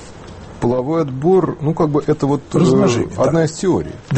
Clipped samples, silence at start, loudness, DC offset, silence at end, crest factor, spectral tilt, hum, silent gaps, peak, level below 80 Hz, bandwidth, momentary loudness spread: under 0.1%; 0 s; -16 LUFS; under 0.1%; 0 s; 14 dB; -7 dB/octave; none; none; -2 dBFS; -42 dBFS; 8.8 kHz; 7 LU